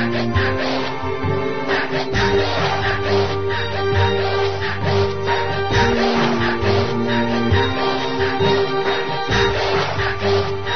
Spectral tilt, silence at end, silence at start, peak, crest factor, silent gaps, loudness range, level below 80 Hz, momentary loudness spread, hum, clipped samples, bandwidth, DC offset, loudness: -6 dB/octave; 0 s; 0 s; -4 dBFS; 16 dB; none; 1 LU; -38 dBFS; 4 LU; none; under 0.1%; 6.6 kHz; 4%; -19 LUFS